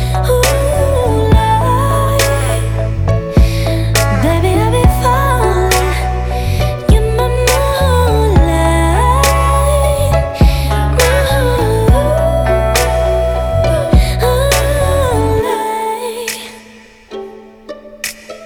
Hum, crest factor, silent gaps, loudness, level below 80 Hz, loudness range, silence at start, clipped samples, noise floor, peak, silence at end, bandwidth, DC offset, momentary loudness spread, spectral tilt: none; 12 dB; none; -13 LUFS; -16 dBFS; 3 LU; 0 s; under 0.1%; -39 dBFS; 0 dBFS; 0 s; 18.5 kHz; under 0.1%; 8 LU; -5.5 dB/octave